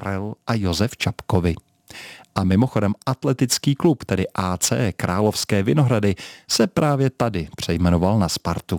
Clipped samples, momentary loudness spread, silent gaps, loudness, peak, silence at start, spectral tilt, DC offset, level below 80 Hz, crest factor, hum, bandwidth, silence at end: under 0.1%; 8 LU; none; -21 LUFS; -2 dBFS; 0 s; -5.5 dB/octave; under 0.1%; -42 dBFS; 18 dB; none; 19 kHz; 0 s